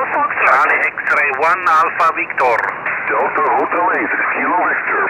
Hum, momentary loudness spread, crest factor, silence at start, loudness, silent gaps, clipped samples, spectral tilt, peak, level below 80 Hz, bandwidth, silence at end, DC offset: none; 5 LU; 14 dB; 0 s; -14 LUFS; none; under 0.1%; -4.5 dB/octave; 0 dBFS; -58 dBFS; 17 kHz; 0 s; under 0.1%